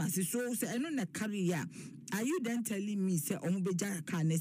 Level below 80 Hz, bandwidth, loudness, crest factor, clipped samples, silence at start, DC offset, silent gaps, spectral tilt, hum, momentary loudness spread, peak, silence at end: -80 dBFS; 15.5 kHz; -35 LUFS; 14 dB; under 0.1%; 0 s; under 0.1%; none; -5 dB/octave; none; 4 LU; -22 dBFS; 0 s